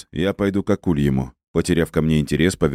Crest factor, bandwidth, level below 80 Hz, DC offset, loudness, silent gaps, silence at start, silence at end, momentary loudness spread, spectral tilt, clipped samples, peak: 18 dB; 15 kHz; -36 dBFS; under 0.1%; -20 LUFS; 1.48-1.54 s; 0.15 s; 0 s; 5 LU; -6.5 dB/octave; under 0.1%; -2 dBFS